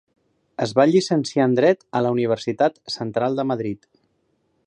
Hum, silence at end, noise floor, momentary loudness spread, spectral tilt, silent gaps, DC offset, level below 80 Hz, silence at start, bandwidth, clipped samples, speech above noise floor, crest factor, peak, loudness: none; 0.9 s; -68 dBFS; 11 LU; -6 dB/octave; none; under 0.1%; -66 dBFS; 0.6 s; 10.5 kHz; under 0.1%; 48 dB; 20 dB; -2 dBFS; -21 LUFS